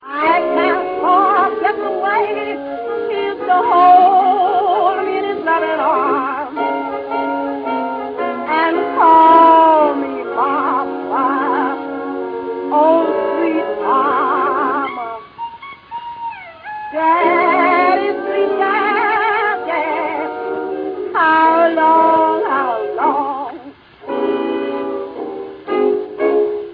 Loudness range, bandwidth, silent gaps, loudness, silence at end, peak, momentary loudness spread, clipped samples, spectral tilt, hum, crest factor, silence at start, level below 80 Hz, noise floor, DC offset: 7 LU; 5.2 kHz; none; -15 LUFS; 0 s; 0 dBFS; 14 LU; under 0.1%; -7.5 dB/octave; none; 16 dB; 0 s; -60 dBFS; -37 dBFS; under 0.1%